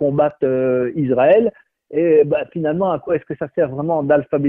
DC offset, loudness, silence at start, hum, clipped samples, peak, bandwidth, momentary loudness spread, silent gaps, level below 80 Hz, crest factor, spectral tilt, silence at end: under 0.1%; -18 LUFS; 0 s; none; under 0.1%; -2 dBFS; 3.6 kHz; 8 LU; none; -56 dBFS; 14 dB; -11 dB/octave; 0 s